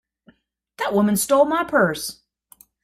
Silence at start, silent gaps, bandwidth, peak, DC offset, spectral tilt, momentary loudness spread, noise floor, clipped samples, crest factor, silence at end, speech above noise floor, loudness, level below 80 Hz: 0.8 s; none; 16 kHz; -4 dBFS; under 0.1%; -4.5 dB/octave; 11 LU; -57 dBFS; under 0.1%; 18 dB; 0.7 s; 38 dB; -20 LUFS; -58 dBFS